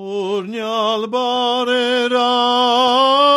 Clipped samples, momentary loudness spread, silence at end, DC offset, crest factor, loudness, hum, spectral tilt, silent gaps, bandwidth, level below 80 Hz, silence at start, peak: under 0.1%; 9 LU; 0 s; under 0.1%; 12 dB; -16 LUFS; none; -3 dB/octave; none; 12.5 kHz; -68 dBFS; 0 s; -4 dBFS